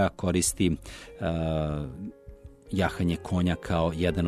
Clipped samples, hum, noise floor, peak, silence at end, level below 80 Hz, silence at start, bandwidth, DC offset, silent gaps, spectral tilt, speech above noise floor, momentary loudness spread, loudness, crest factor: under 0.1%; none; -48 dBFS; -12 dBFS; 0 s; -42 dBFS; 0 s; 13 kHz; under 0.1%; none; -5.5 dB/octave; 20 dB; 11 LU; -28 LUFS; 16 dB